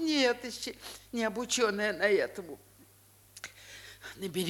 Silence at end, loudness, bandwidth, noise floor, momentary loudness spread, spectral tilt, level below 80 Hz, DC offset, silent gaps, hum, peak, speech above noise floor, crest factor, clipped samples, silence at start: 0 s; -31 LUFS; 19.5 kHz; -61 dBFS; 19 LU; -3 dB/octave; -66 dBFS; under 0.1%; none; none; -14 dBFS; 28 dB; 20 dB; under 0.1%; 0 s